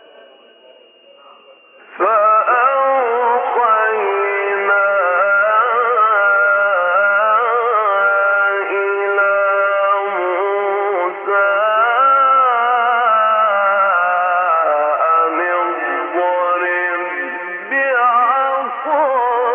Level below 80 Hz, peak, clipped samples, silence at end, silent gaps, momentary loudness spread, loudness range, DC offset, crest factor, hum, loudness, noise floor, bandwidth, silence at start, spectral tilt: -88 dBFS; -4 dBFS; under 0.1%; 0 s; none; 6 LU; 3 LU; under 0.1%; 12 dB; none; -14 LUFS; -46 dBFS; 3.7 kHz; 1.9 s; 1 dB/octave